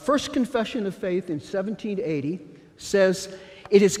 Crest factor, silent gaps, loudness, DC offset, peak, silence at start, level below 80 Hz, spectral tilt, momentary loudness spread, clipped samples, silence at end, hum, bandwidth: 20 dB; none; -25 LUFS; under 0.1%; -4 dBFS; 0 s; -58 dBFS; -5 dB/octave; 14 LU; under 0.1%; 0 s; none; 15 kHz